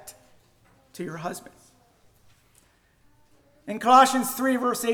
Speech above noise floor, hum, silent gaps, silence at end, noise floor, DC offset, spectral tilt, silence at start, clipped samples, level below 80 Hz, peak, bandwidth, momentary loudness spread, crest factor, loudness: 39 dB; none; none; 0 s; -62 dBFS; under 0.1%; -3 dB/octave; 0.05 s; under 0.1%; -66 dBFS; -6 dBFS; over 20 kHz; 21 LU; 20 dB; -22 LUFS